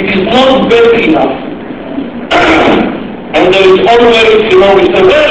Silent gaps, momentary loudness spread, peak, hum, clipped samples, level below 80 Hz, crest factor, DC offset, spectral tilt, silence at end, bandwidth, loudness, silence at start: none; 14 LU; 0 dBFS; none; 4%; -34 dBFS; 6 dB; 0.9%; -5.5 dB/octave; 0 s; 8 kHz; -6 LUFS; 0 s